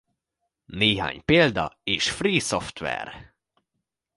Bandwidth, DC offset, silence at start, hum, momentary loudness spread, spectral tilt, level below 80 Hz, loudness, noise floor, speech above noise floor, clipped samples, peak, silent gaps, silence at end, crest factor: 11.5 kHz; under 0.1%; 0.7 s; none; 12 LU; -4 dB/octave; -50 dBFS; -23 LUFS; -82 dBFS; 57 dB; under 0.1%; -4 dBFS; none; 0.95 s; 22 dB